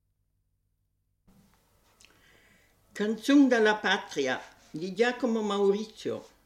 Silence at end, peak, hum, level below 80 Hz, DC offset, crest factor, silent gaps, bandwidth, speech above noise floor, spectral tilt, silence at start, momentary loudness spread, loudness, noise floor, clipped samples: 0.2 s; -12 dBFS; 50 Hz at -65 dBFS; -72 dBFS; under 0.1%; 18 dB; none; 13.5 kHz; 49 dB; -4.5 dB/octave; 2.95 s; 15 LU; -27 LUFS; -76 dBFS; under 0.1%